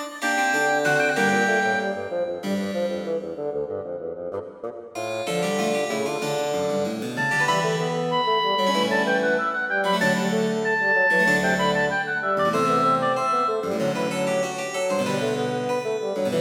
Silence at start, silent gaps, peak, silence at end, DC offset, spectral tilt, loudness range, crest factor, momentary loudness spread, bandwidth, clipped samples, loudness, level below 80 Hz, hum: 0 s; none; -8 dBFS; 0 s; under 0.1%; -4 dB/octave; 7 LU; 14 dB; 9 LU; 16.5 kHz; under 0.1%; -23 LUFS; -64 dBFS; none